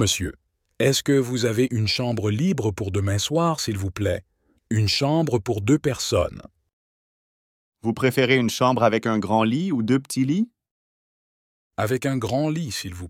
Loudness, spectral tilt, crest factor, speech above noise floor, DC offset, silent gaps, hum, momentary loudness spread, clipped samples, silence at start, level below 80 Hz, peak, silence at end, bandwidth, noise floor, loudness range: -23 LUFS; -5 dB/octave; 18 dB; over 68 dB; under 0.1%; 6.73-7.72 s, 10.71-11.71 s; none; 8 LU; under 0.1%; 0 s; -52 dBFS; -6 dBFS; 0 s; 16.5 kHz; under -90 dBFS; 3 LU